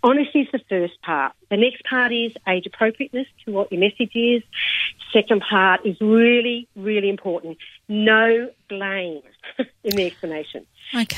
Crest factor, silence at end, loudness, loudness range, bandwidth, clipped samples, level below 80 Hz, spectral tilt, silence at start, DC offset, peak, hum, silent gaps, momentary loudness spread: 18 dB; 0 s; -20 LUFS; 4 LU; 16 kHz; under 0.1%; -64 dBFS; -5 dB/octave; 0.05 s; under 0.1%; -2 dBFS; none; none; 14 LU